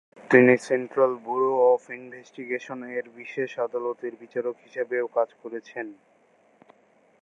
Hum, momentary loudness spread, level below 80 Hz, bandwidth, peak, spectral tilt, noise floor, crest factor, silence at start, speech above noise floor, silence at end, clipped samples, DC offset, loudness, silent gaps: none; 18 LU; -82 dBFS; 11 kHz; -2 dBFS; -6.5 dB/octave; -60 dBFS; 24 dB; 0.2 s; 34 dB; 1.3 s; under 0.1%; under 0.1%; -25 LUFS; none